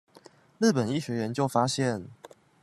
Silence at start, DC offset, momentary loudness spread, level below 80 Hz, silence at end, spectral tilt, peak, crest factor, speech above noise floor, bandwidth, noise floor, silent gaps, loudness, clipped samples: 0.6 s; under 0.1%; 8 LU; -68 dBFS; 0.35 s; -5.5 dB/octave; -10 dBFS; 20 dB; 29 dB; 13 kHz; -56 dBFS; none; -28 LUFS; under 0.1%